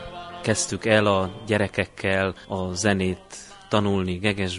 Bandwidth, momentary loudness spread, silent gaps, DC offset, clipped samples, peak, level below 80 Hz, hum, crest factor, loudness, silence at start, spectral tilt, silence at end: 11.5 kHz; 10 LU; none; under 0.1%; under 0.1%; -4 dBFS; -44 dBFS; none; 22 dB; -24 LUFS; 0 s; -4.5 dB/octave; 0 s